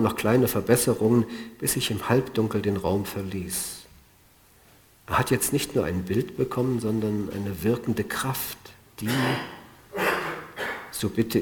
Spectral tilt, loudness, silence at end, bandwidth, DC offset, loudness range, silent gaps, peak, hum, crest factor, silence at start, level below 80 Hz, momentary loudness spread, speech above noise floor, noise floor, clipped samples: -5 dB/octave; -26 LUFS; 0 s; over 20 kHz; under 0.1%; 4 LU; none; -4 dBFS; none; 22 dB; 0 s; -52 dBFS; 11 LU; 32 dB; -57 dBFS; under 0.1%